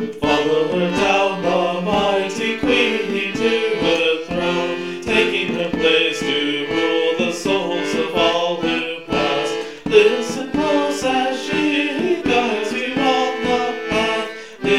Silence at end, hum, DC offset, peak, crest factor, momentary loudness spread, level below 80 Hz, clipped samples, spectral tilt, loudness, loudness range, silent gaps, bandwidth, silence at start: 0 s; none; 0.4%; 0 dBFS; 18 dB; 5 LU; -48 dBFS; under 0.1%; -4 dB/octave; -18 LUFS; 1 LU; none; 14.5 kHz; 0 s